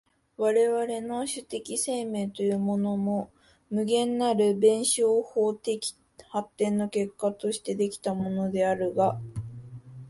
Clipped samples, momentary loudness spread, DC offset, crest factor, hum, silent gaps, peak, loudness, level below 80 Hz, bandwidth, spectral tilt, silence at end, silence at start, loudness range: under 0.1%; 11 LU; under 0.1%; 18 dB; none; none; -10 dBFS; -27 LUFS; -64 dBFS; 12 kHz; -5 dB/octave; 0 s; 0.4 s; 4 LU